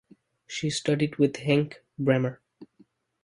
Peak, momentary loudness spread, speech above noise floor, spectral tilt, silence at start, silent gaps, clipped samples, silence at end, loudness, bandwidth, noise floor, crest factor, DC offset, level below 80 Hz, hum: -8 dBFS; 9 LU; 37 dB; -6 dB/octave; 0.5 s; none; under 0.1%; 0.6 s; -27 LUFS; 11.5 kHz; -62 dBFS; 20 dB; under 0.1%; -64 dBFS; none